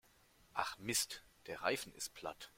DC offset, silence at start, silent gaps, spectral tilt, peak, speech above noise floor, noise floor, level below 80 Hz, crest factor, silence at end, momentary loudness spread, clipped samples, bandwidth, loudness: under 0.1%; 0.55 s; none; -1.5 dB/octave; -18 dBFS; 27 dB; -69 dBFS; -72 dBFS; 26 dB; 0.1 s; 12 LU; under 0.1%; 16.5 kHz; -41 LUFS